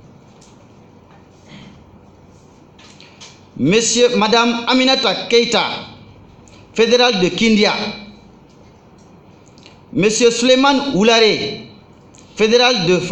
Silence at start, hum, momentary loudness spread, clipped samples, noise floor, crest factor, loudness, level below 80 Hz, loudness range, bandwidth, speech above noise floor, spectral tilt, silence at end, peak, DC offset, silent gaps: 1.5 s; none; 14 LU; under 0.1%; -45 dBFS; 16 dB; -14 LUFS; -50 dBFS; 4 LU; 10.5 kHz; 31 dB; -3.5 dB/octave; 0 s; 0 dBFS; under 0.1%; none